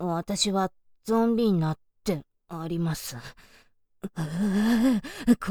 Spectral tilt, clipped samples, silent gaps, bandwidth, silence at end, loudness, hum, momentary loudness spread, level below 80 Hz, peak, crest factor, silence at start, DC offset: -5.5 dB/octave; under 0.1%; none; 20 kHz; 0 s; -27 LUFS; none; 17 LU; -52 dBFS; -8 dBFS; 18 dB; 0 s; under 0.1%